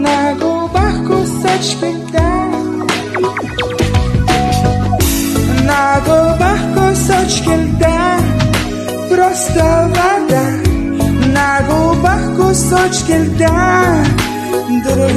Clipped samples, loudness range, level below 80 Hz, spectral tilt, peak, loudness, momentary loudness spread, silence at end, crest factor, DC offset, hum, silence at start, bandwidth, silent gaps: under 0.1%; 3 LU; -24 dBFS; -5 dB/octave; 0 dBFS; -13 LUFS; 5 LU; 0 s; 12 dB; under 0.1%; none; 0 s; 13.5 kHz; none